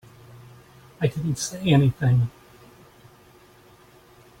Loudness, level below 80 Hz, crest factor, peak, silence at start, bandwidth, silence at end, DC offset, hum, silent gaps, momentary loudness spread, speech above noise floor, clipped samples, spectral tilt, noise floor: -23 LUFS; -54 dBFS; 20 dB; -8 dBFS; 0.35 s; 16 kHz; 2.1 s; under 0.1%; none; none; 8 LU; 32 dB; under 0.1%; -6 dB/octave; -53 dBFS